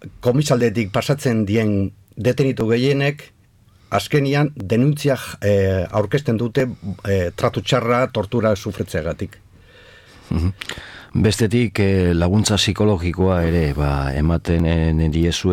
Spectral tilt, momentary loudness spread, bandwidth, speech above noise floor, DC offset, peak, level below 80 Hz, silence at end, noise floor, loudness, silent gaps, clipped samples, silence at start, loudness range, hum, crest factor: -6 dB/octave; 8 LU; 16.5 kHz; 34 dB; under 0.1%; -4 dBFS; -34 dBFS; 0 s; -52 dBFS; -19 LUFS; none; under 0.1%; 0 s; 4 LU; none; 14 dB